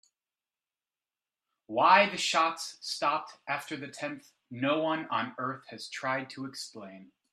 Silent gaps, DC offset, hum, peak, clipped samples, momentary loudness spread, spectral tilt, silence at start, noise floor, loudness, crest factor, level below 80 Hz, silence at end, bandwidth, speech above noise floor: none; under 0.1%; none; -8 dBFS; under 0.1%; 19 LU; -3 dB/octave; 1.7 s; under -90 dBFS; -30 LUFS; 24 dB; -84 dBFS; 0.3 s; 14 kHz; over 59 dB